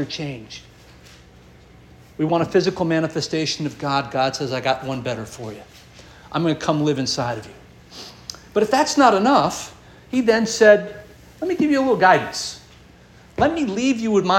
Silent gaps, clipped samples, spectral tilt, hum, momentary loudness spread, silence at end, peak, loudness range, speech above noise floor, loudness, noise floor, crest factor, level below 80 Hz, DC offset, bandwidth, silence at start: none; under 0.1%; -4.5 dB/octave; 60 Hz at -55 dBFS; 20 LU; 0 s; -2 dBFS; 7 LU; 28 dB; -20 LUFS; -47 dBFS; 20 dB; -52 dBFS; under 0.1%; 16.5 kHz; 0 s